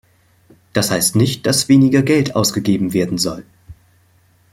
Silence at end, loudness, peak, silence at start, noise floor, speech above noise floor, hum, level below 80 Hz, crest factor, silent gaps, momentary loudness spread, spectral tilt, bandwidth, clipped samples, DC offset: 0.8 s; -15 LUFS; -2 dBFS; 0.75 s; -54 dBFS; 39 dB; none; -50 dBFS; 16 dB; none; 9 LU; -4.5 dB/octave; 16.5 kHz; under 0.1%; under 0.1%